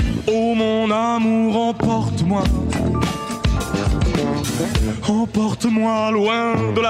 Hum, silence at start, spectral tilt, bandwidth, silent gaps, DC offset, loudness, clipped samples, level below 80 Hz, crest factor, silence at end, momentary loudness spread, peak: none; 0 s; -6 dB/octave; 16 kHz; none; under 0.1%; -19 LUFS; under 0.1%; -28 dBFS; 14 dB; 0 s; 3 LU; -4 dBFS